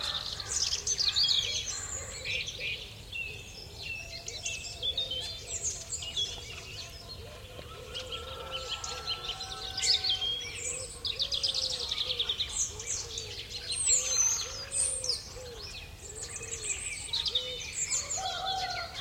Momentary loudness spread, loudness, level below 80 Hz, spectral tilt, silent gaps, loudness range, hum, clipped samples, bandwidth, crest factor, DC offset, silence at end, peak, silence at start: 16 LU; -31 LUFS; -52 dBFS; 0.5 dB/octave; none; 7 LU; none; under 0.1%; 16.5 kHz; 20 dB; under 0.1%; 0 s; -14 dBFS; 0 s